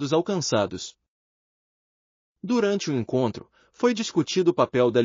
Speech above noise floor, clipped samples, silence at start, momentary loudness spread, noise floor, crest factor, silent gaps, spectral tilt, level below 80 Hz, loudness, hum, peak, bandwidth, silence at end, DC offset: over 67 dB; under 0.1%; 0 s; 13 LU; under -90 dBFS; 18 dB; 1.08-2.35 s; -5 dB/octave; -68 dBFS; -24 LUFS; none; -6 dBFS; 7.4 kHz; 0 s; under 0.1%